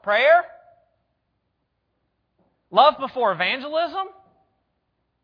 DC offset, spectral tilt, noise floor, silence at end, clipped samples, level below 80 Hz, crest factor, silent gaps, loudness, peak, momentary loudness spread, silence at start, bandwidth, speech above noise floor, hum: under 0.1%; -5.5 dB/octave; -74 dBFS; 1.15 s; under 0.1%; -72 dBFS; 22 dB; none; -20 LUFS; -2 dBFS; 14 LU; 0.05 s; 5.2 kHz; 54 dB; none